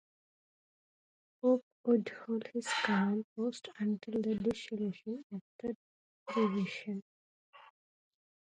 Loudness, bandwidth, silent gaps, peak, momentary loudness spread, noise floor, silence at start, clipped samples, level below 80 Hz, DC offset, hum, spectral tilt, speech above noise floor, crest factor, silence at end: -35 LUFS; 10.5 kHz; 1.62-1.84 s, 3.24-3.36 s, 5.23-5.30 s, 5.41-5.59 s, 5.75-6.26 s, 7.02-7.53 s; -18 dBFS; 12 LU; under -90 dBFS; 1.45 s; under 0.1%; -74 dBFS; under 0.1%; none; -6 dB/octave; over 55 dB; 20 dB; 0.8 s